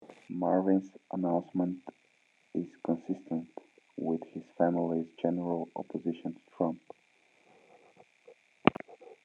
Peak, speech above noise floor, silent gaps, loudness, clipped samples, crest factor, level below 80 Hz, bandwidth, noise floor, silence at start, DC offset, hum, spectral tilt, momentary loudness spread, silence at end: -2 dBFS; 36 dB; none; -33 LUFS; under 0.1%; 32 dB; -76 dBFS; 7 kHz; -69 dBFS; 0 s; under 0.1%; none; -8.5 dB/octave; 16 LU; 0.1 s